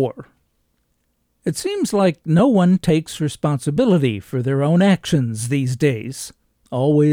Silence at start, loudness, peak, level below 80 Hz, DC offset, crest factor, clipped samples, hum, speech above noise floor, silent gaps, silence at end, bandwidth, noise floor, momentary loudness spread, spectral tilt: 0 s; -18 LUFS; -6 dBFS; -52 dBFS; under 0.1%; 14 dB; under 0.1%; none; 50 dB; none; 0 s; 16 kHz; -68 dBFS; 11 LU; -6.5 dB/octave